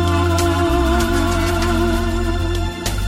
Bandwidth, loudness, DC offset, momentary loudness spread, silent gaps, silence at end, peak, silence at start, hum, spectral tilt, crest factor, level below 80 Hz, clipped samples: 16 kHz; -18 LUFS; under 0.1%; 5 LU; none; 0 s; -6 dBFS; 0 s; none; -5.5 dB/octave; 12 dB; -22 dBFS; under 0.1%